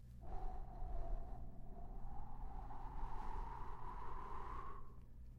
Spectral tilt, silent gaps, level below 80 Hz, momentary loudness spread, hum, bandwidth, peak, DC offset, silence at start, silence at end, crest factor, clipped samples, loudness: -8 dB/octave; none; -48 dBFS; 6 LU; none; 4.3 kHz; -32 dBFS; under 0.1%; 0 s; 0 s; 14 dB; under 0.1%; -53 LUFS